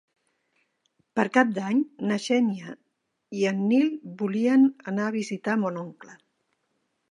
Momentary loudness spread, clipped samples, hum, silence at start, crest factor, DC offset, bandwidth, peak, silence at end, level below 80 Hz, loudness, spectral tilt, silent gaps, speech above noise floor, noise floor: 12 LU; under 0.1%; none; 1.15 s; 22 dB; under 0.1%; 10.5 kHz; -4 dBFS; 1 s; -78 dBFS; -25 LUFS; -6 dB/octave; none; 53 dB; -77 dBFS